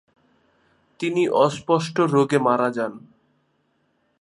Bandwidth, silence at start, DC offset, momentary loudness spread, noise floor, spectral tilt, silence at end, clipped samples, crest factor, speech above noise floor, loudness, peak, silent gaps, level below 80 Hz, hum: 11.5 kHz; 1 s; under 0.1%; 10 LU; -68 dBFS; -6 dB/octave; 1.2 s; under 0.1%; 20 dB; 47 dB; -21 LUFS; -4 dBFS; none; -70 dBFS; none